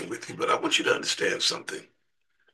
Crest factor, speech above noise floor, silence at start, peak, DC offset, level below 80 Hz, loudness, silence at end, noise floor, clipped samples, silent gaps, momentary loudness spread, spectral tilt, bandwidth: 20 dB; 48 dB; 0 s; -8 dBFS; under 0.1%; -76 dBFS; -26 LUFS; 0.7 s; -76 dBFS; under 0.1%; none; 13 LU; -1.5 dB/octave; 12.5 kHz